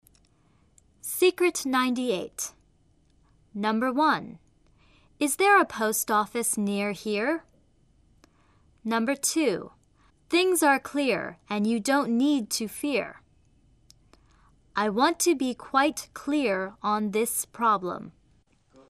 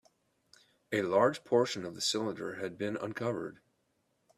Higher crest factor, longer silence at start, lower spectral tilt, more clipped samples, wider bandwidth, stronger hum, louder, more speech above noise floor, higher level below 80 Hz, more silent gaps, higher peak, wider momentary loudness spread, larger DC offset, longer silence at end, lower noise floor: about the same, 20 dB vs 22 dB; first, 1.05 s vs 0.9 s; about the same, -3 dB/octave vs -4 dB/octave; neither; about the same, 14.5 kHz vs 14.5 kHz; neither; first, -26 LUFS vs -33 LUFS; second, 38 dB vs 45 dB; first, -64 dBFS vs -76 dBFS; neither; first, -8 dBFS vs -12 dBFS; about the same, 12 LU vs 11 LU; neither; about the same, 0.8 s vs 0.8 s; second, -64 dBFS vs -77 dBFS